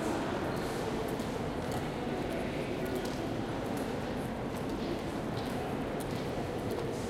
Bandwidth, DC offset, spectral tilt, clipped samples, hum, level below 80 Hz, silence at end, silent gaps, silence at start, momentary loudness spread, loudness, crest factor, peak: 16.5 kHz; under 0.1%; -6 dB/octave; under 0.1%; none; -50 dBFS; 0 s; none; 0 s; 2 LU; -36 LUFS; 14 dB; -22 dBFS